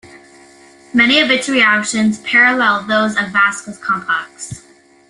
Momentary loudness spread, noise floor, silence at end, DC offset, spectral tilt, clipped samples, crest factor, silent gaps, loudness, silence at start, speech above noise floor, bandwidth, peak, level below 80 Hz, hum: 14 LU; -44 dBFS; 0.5 s; under 0.1%; -3 dB/octave; under 0.1%; 16 dB; none; -13 LUFS; 0.05 s; 29 dB; 11.5 kHz; 0 dBFS; -56 dBFS; none